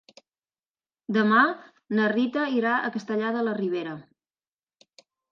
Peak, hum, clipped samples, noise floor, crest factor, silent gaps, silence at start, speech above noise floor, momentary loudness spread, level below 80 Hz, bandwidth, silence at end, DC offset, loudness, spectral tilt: -6 dBFS; none; under 0.1%; under -90 dBFS; 22 dB; none; 1.1 s; over 66 dB; 16 LU; -80 dBFS; 7 kHz; 1.3 s; under 0.1%; -25 LUFS; -6.5 dB/octave